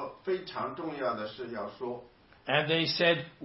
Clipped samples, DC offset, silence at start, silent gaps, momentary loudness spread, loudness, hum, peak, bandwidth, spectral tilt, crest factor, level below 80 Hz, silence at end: under 0.1%; under 0.1%; 0 s; none; 14 LU; -31 LUFS; none; -10 dBFS; 6 kHz; -7 dB/octave; 22 dB; -68 dBFS; 0 s